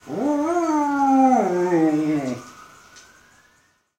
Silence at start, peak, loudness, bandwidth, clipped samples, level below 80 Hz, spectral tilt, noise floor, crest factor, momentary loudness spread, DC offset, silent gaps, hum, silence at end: 0.05 s; -6 dBFS; -20 LUFS; 15 kHz; under 0.1%; -64 dBFS; -6.5 dB/octave; -61 dBFS; 14 dB; 9 LU; under 0.1%; none; none; 1 s